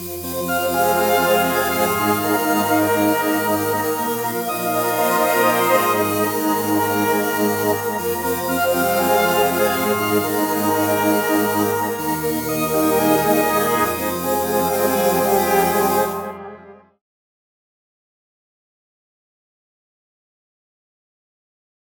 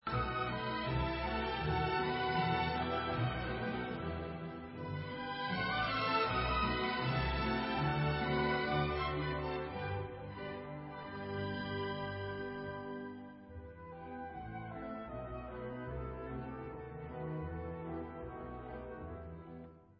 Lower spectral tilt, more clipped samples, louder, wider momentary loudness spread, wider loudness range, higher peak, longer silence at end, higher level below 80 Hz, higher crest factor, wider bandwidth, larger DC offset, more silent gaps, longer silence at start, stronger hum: about the same, -4 dB/octave vs -4 dB/octave; neither; first, -18 LUFS vs -38 LUFS; second, 6 LU vs 13 LU; second, 2 LU vs 11 LU; first, -4 dBFS vs -20 dBFS; first, 5.2 s vs 0.05 s; about the same, -54 dBFS vs -50 dBFS; about the same, 16 dB vs 18 dB; first, 19.5 kHz vs 5.6 kHz; neither; neither; about the same, 0 s vs 0.05 s; neither